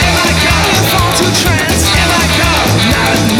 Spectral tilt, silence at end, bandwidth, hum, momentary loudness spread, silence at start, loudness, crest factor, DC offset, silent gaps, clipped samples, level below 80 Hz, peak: -3.5 dB/octave; 0 s; 19.5 kHz; none; 1 LU; 0 s; -9 LUFS; 10 dB; under 0.1%; none; under 0.1%; -22 dBFS; 0 dBFS